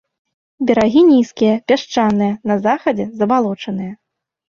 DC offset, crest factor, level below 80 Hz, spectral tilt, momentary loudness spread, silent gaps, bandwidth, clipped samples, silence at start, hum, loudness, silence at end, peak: under 0.1%; 14 dB; -54 dBFS; -6.5 dB/octave; 12 LU; none; 7.2 kHz; under 0.1%; 0.6 s; none; -15 LUFS; 0.55 s; 0 dBFS